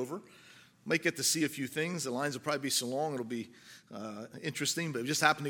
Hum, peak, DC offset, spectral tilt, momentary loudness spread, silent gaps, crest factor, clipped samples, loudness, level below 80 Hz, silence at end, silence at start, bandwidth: none; -8 dBFS; under 0.1%; -3 dB/octave; 16 LU; none; 26 dB; under 0.1%; -33 LUFS; -82 dBFS; 0 s; 0 s; 17 kHz